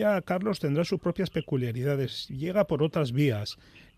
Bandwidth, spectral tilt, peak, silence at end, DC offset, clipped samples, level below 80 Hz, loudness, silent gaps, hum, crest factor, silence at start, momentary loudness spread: 14.5 kHz; -7 dB/octave; -12 dBFS; 0.15 s; under 0.1%; under 0.1%; -58 dBFS; -28 LUFS; none; none; 14 dB; 0 s; 7 LU